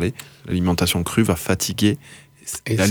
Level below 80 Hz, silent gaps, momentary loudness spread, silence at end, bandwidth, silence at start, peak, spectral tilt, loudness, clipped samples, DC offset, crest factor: -44 dBFS; none; 12 LU; 0 s; over 20 kHz; 0 s; -4 dBFS; -4.5 dB/octave; -21 LUFS; under 0.1%; under 0.1%; 16 dB